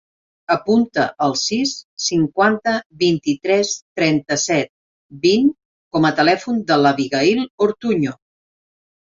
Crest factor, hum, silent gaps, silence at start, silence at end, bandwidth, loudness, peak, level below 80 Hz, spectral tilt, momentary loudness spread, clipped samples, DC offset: 16 dB; none; 1.84-1.97 s, 2.86-2.90 s, 3.82-3.96 s, 4.69-5.09 s, 5.65-5.91 s, 7.50-7.58 s; 0.5 s; 0.9 s; 7.8 kHz; -18 LUFS; -2 dBFS; -58 dBFS; -4 dB/octave; 6 LU; under 0.1%; under 0.1%